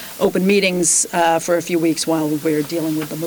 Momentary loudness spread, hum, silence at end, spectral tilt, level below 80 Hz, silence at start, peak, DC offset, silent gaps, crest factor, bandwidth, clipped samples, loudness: 6 LU; none; 0 s; -3.5 dB/octave; -58 dBFS; 0 s; -6 dBFS; under 0.1%; none; 12 dB; over 20 kHz; under 0.1%; -17 LUFS